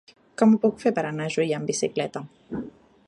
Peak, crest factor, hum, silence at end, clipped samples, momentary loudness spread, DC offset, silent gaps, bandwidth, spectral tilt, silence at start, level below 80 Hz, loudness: -6 dBFS; 18 dB; none; 0.4 s; under 0.1%; 17 LU; under 0.1%; none; 11 kHz; -5.5 dB/octave; 0.4 s; -64 dBFS; -24 LUFS